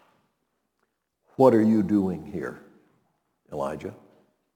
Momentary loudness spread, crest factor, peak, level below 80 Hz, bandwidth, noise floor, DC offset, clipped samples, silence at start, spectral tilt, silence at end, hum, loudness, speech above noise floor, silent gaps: 21 LU; 22 dB; -6 dBFS; -64 dBFS; 16 kHz; -76 dBFS; under 0.1%; under 0.1%; 1.4 s; -8.5 dB/octave; 0.65 s; none; -23 LUFS; 53 dB; none